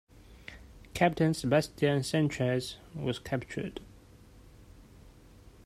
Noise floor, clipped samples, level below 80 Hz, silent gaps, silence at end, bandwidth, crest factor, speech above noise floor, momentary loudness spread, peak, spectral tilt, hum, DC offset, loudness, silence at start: -55 dBFS; under 0.1%; -56 dBFS; none; 0.55 s; 15 kHz; 22 dB; 25 dB; 22 LU; -10 dBFS; -6 dB/octave; none; under 0.1%; -31 LUFS; 0.3 s